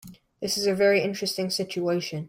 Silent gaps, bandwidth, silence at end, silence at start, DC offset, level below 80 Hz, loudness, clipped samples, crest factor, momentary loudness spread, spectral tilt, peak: none; 16.5 kHz; 0 s; 0.05 s; under 0.1%; -66 dBFS; -25 LUFS; under 0.1%; 16 dB; 7 LU; -4 dB/octave; -10 dBFS